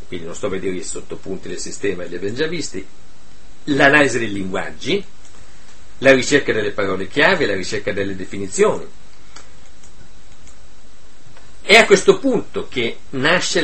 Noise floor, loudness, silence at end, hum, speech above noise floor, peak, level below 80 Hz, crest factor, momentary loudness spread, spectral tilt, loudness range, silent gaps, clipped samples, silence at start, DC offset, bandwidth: -47 dBFS; -17 LUFS; 0 s; none; 29 dB; 0 dBFS; -46 dBFS; 20 dB; 17 LU; -3.5 dB/octave; 9 LU; none; under 0.1%; 0.1 s; 6%; 8.8 kHz